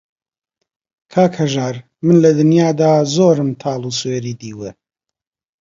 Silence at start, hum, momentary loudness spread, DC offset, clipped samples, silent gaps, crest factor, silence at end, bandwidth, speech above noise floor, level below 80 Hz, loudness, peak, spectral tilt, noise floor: 1.15 s; none; 16 LU; under 0.1%; under 0.1%; none; 16 dB; 0.9 s; 7.8 kHz; 69 dB; -58 dBFS; -15 LUFS; 0 dBFS; -6.5 dB/octave; -83 dBFS